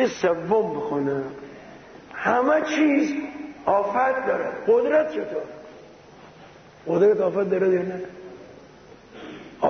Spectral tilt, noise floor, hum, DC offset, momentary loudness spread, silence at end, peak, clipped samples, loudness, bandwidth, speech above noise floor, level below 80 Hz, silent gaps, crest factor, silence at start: -6 dB/octave; -47 dBFS; none; under 0.1%; 21 LU; 0 s; -8 dBFS; under 0.1%; -23 LUFS; 6.6 kHz; 26 dB; -62 dBFS; none; 16 dB; 0 s